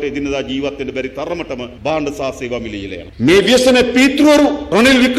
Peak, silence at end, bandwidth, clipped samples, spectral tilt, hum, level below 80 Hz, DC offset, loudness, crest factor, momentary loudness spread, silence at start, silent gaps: -2 dBFS; 0 s; 14.5 kHz; under 0.1%; -4 dB/octave; none; -38 dBFS; under 0.1%; -14 LUFS; 12 dB; 13 LU; 0 s; none